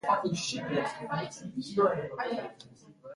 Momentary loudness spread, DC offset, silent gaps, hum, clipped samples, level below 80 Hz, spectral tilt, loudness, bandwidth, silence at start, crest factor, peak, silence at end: 14 LU; under 0.1%; none; none; under 0.1%; -68 dBFS; -4.5 dB/octave; -32 LUFS; 11.5 kHz; 0.05 s; 18 dB; -14 dBFS; 0 s